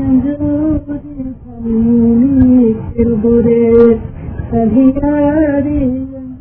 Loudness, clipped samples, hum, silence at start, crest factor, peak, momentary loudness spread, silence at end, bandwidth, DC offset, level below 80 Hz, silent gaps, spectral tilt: -11 LUFS; 0.2%; none; 0 s; 12 dB; 0 dBFS; 16 LU; 0 s; 3.2 kHz; under 0.1%; -28 dBFS; none; -13 dB/octave